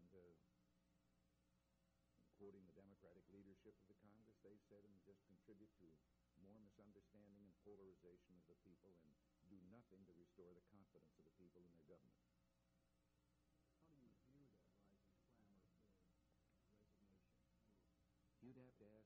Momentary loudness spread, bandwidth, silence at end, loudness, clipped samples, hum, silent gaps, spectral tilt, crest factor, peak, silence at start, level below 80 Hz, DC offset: 4 LU; 4.6 kHz; 0 s; -68 LUFS; under 0.1%; none; none; -7.5 dB/octave; 18 dB; -54 dBFS; 0 s; -88 dBFS; under 0.1%